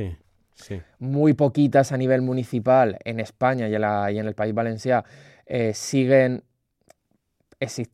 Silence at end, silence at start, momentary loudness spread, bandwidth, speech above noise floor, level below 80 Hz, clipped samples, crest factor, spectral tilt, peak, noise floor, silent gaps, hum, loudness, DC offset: 0.1 s; 0 s; 14 LU; 14 kHz; 48 dB; -56 dBFS; under 0.1%; 18 dB; -6.5 dB/octave; -4 dBFS; -70 dBFS; none; none; -22 LUFS; under 0.1%